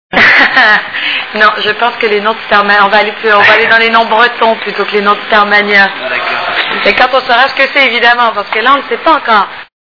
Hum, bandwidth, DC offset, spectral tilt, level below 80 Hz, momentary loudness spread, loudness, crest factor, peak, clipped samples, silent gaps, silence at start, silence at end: none; 5.4 kHz; 0.4%; -4 dB/octave; -46 dBFS; 8 LU; -7 LUFS; 8 dB; 0 dBFS; 3%; none; 0.1 s; 0.2 s